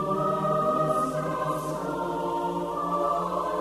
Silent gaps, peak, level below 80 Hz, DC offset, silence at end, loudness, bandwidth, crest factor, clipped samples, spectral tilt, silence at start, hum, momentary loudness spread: none; -14 dBFS; -54 dBFS; under 0.1%; 0 s; -27 LUFS; 13 kHz; 14 dB; under 0.1%; -6.5 dB/octave; 0 s; none; 5 LU